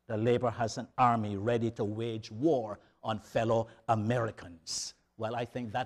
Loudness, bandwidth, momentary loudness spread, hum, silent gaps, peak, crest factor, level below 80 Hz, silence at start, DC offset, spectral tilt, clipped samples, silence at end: -32 LUFS; 12.5 kHz; 10 LU; none; none; -14 dBFS; 20 dB; -64 dBFS; 0.1 s; under 0.1%; -5.5 dB/octave; under 0.1%; 0 s